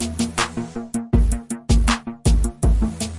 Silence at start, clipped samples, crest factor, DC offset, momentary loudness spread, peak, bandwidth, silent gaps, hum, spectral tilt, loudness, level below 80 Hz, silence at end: 0 s; under 0.1%; 14 dB; under 0.1%; 8 LU; -6 dBFS; 11.5 kHz; none; none; -5 dB/octave; -22 LUFS; -22 dBFS; 0 s